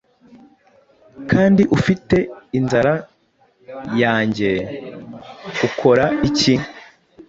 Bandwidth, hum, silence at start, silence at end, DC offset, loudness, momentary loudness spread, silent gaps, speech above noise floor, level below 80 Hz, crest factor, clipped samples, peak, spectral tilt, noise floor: 8 kHz; none; 1.15 s; 0.05 s; under 0.1%; -17 LUFS; 20 LU; none; 42 dB; -46 dBFS; 18 dB; under 0.1%; -2 dBFS; -6 dB/octave; -59 dBFS